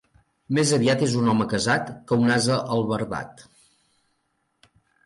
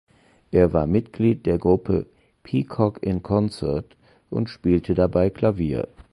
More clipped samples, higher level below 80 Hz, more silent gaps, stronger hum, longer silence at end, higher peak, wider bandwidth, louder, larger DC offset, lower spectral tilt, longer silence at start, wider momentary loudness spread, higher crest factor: neither; second, -58 dBFS vs -40 dBFS; neither; neither; first, 1.75 s vs 0.25 s; second, -8 dBFS vs -4 dBFS; about the same, 11.5 kHz vs 11.5 kHz; about the same, -22 LUFS vs -22 LUFS; neither; second, -5 dB/octave vs -9.5 dB/octave; about the same, 0.5 s vs 0.5 s; about the same, 8 LU vs 9 LU; about the same, 16 dB vs 18 dB